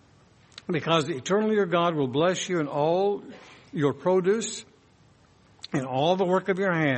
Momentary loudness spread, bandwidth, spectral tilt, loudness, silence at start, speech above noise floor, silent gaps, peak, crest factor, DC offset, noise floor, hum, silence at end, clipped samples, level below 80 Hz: 11 LU; 8.8 kHz; -5 dB/octave; -25 LUFS; 0.7 s; 34 dB; none; -8 dBFS; 18 dB; under 0.1%; -58 dBFS; none; 0 s; under 0.1%; -68 dBFS